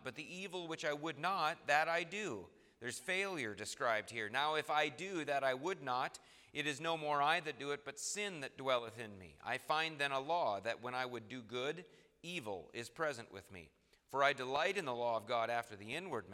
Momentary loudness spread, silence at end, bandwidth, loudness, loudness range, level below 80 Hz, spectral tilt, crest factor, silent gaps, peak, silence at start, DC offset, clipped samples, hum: 13 LU; 0 s; 16 kHz; -39 LUFS; 3 LU; -80 dBFS; -3 dB/octave; 22 dB; none; -18 dBFS; 0 s; under 0.1%; under 0.1%; none